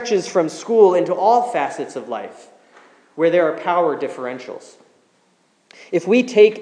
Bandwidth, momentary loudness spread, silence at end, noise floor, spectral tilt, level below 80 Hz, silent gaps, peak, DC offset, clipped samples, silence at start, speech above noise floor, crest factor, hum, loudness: 10 kHz; 17 LU; 0 s; -60 dBFS; -5 dB/octave; -86 dBFS; none; 0 dBFS; under 0.1%; under 0.1%; 0 s; 43 dB; 18 dB; none; -18 LUFS